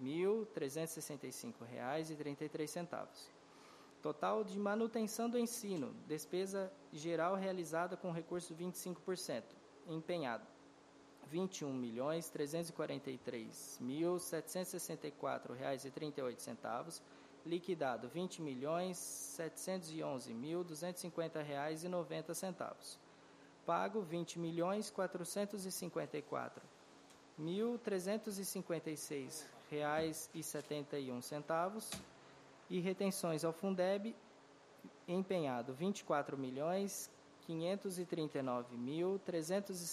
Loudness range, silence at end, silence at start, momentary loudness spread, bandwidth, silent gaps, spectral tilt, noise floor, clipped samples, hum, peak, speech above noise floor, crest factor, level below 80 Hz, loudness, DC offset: 4 LU; 0 s; 0 s; 11 LU; 15 kHz; none; -5 dB/octave; -64 dBFS; under 0.1%; none; -24 dBFS; 21 dB; 18 dB; -84 dBFS; -43 LUFS; under 0.1%